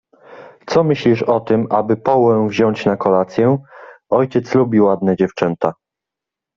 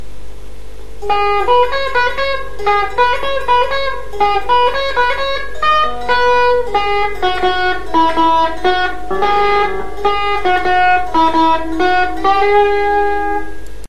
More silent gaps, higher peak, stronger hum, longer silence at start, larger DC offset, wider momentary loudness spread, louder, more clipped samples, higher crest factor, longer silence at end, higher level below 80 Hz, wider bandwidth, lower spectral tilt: neither; about the same, -2 dBFS vs 0 dBFS; second, none vs 50 Hz at -35 dBFS; first, 0.3 s vs 0 s; second, under 0.1% vs 10%; about the same, 5 LU vs 7 LU; about the same, -16 LUFS vs -14 LUFS; neither; about the same, 14 dB vs 14 dB; first, 0.85 s vs 0 s; second, -56 dBFS vs -34 dBFS; second, 7.4 kHz vs 13 kHz; first, -8 dB/octave vs -4.5 dB/octave